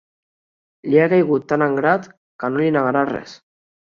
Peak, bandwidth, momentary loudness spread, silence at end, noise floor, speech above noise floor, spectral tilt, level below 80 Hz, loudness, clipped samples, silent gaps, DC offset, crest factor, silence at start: -2 dBFS; 7 kHz; 11 LU; 0.65 s; under -90 dBFS; over 73 dB; -8 dB/octave; -62 dBFS; -18 LUFS; under 0.1%; 2.17-2.39 s; under 0.1%; 18 dB; 0.85 s